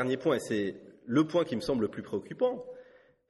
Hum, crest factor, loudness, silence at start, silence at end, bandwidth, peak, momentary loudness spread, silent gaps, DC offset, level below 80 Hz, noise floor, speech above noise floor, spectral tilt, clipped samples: none; 18 dB; -31 LUFS; 0 s; 0.45 s; 12 kHz; -14 dBFS; 15 LU; none; under 0.1%; -66 dBFS; -57 dBFS; 27 dB; -6 dB/octave; under 0.1%